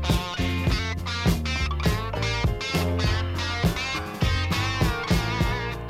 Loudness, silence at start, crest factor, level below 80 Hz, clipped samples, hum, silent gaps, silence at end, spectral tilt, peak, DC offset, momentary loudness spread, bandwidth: -25 LUFS; 0 s; 16 dB; -32 dBFS; under 0.1%; none; none; 0 s; -5 dB/octave; -8 dBFS; under 0.1%; 3 LU; 16 kHz